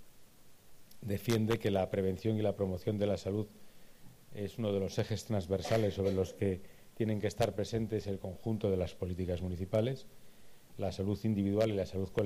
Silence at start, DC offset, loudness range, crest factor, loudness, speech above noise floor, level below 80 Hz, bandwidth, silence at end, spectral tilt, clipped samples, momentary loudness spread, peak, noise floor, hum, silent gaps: 0 s; under 0.1%; 2 LU; 18 dB; -35 LUFS; 22 dB; -58 dBFS; 15.5 kHz; 0 s; -7 dB/octave; under 0.1%; 8 LU; -18 dBFS; -56 dBFS; none; none